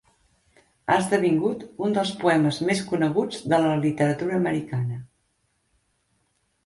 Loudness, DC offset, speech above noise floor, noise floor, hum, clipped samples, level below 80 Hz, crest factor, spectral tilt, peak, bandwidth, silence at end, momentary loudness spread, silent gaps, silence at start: -24 LUFS; under 0.1%; 48 dB; -71 dBFS; none; under 0.1%; -62 dBFS; 18 dB; -6 dB/octave; -6 dBFS; 11.5 kHz; 1.6 s; 8 LU; none; 0.85 s